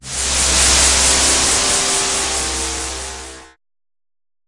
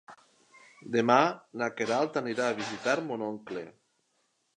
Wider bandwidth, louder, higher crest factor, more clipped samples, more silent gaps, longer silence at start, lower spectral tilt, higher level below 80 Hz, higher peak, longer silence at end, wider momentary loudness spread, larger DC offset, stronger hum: about the same, 11.5 kHz vs 10.5 kHz; first, -13 LUFS vs -29 LUFS; second, 18 dB vs 24 dB; neither; neither; about the same, 0.05 s vs 0.1 s; second, -0.5 dB/octave vs -4.5 dB/octave; first, -30 dBFS vs -80 dBFS; first, 0 dBFS vs -8 dBFS; first, 1 s vs 0.85 s; about the same, 15 LU vs 16 LU; neither; neither